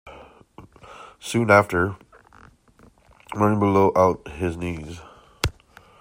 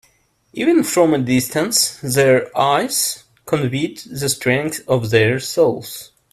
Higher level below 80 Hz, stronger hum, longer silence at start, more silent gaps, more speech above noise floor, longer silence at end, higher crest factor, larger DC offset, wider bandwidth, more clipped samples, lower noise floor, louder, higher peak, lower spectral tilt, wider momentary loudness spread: first, -46 dBFS vs -54 dBFS; neither; second, 0.05 s vs 0.55 s; neither; second, 34 dB vs 42 dB; first, 0.5 s vs 0.3 s; about the same, 22 dB vs 18 dB; neither; about the same, 16 kHz vs 16 kHz; neither; second, -55 dBFS vs -59 dBFS; second, -21 LUFS vs -17 LUFS; about the same, -2 dBFS vs 0 dBFS; first, -6 dB/octave vs -4 dB/octave; first, 23 LU vs 9 LU